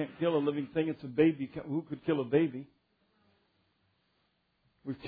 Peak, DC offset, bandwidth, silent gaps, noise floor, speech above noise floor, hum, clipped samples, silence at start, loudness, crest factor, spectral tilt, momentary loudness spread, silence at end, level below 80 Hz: -14 dBFS; under 0.1%; 4.8 kHz; none; -76 dBFS; 45 dB; none; under 0.1%; 0 s; -32 LUFS; 20 dB; -6.5 dB/octave; 12 LU; 0 s; -70 dBFS